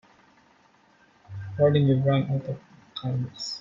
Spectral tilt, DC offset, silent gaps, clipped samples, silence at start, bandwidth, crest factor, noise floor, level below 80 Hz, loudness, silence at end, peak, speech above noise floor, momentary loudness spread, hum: -7.5 dB/octave; under 0.1%; none; under 0.1%; 1.3 s; 7.4 kHz; 18 dB; -60 dBFS; -60 dBFS; -25 LUFS; 0 s; -10 dBFS; 37 dB; 19 LU; none